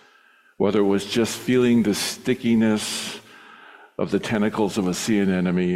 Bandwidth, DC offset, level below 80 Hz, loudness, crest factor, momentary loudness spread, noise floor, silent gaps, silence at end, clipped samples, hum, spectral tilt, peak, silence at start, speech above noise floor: 15.5 kHz; under 0.1%; -58 dBFS; -22 LUFS; 14 dB; 8 LU; -56 dBFS; none; 0 s; under 0.1%; none; -5 dB/octave; -8 dBFS; 0.6 s; 35 dB